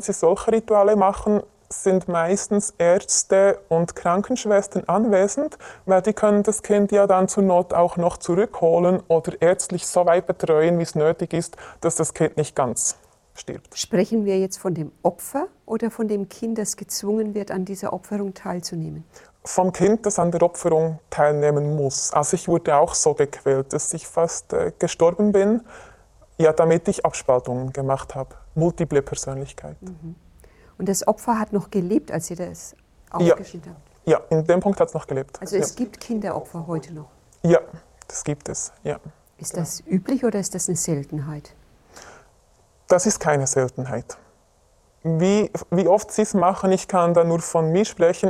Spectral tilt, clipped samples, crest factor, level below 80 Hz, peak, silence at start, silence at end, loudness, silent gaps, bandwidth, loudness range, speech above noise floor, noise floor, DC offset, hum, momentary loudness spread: -5.5 dB/octave; under 0.1%; 18 dB; -52 dBFS; -4 dBFS; 0 s; 0 s; -21 LUFS; none; 15 kHz; 7 LU; 38 dB; -59 dBFS; under 0.1%; none; 13 LU